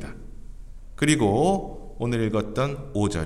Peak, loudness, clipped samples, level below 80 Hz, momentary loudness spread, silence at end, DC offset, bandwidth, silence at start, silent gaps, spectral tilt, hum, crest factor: -4 dBFS; -24 LUFS; under 0.1%; -40 dBFS; 17 LU; 0 s; under 0.1%; 13.5 kHz; 0 s; none; -5.5 dB/octave; none; 20 dB